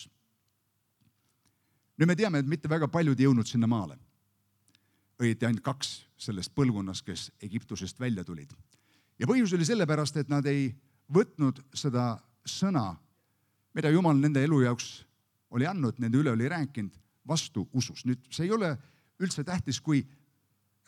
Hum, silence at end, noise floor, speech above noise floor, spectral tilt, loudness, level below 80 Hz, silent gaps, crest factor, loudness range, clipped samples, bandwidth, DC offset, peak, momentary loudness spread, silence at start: none; 0.8 s; -76 dBFS; 48 dB; -6 dB/octave; -29 LUFS; -66 dBFS; none; 18 dB; 4 LU; under 0.1%; 13 kHz; under 0.1%; -12 dBFS; 14 LU; 0 s